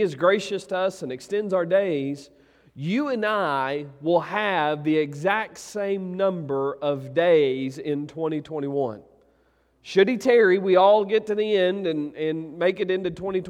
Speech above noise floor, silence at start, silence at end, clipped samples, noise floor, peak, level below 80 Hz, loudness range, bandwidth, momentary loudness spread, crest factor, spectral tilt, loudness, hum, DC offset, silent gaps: 41 dB; 0 s; 0 s; under 0.1%; -63 dBFS; -6 dBFS; -66 dBFS; 5 LU; 12 kHz; 11 LU; 18 dB; -6 dB/octave; -23 LUFS; none; under 0.1%; none